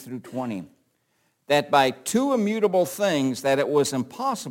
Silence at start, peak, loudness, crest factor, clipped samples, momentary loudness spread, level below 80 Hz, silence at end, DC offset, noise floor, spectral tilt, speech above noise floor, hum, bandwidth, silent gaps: 0 s; -6 dBFS; -23 LUFS; 18 dB; under 0.1%; 11 LU; -68 dBFS; 0 s; under 0.1%; -70 dBFS; -4.5 dB/octave; 47 dB; none; 17 kHz; none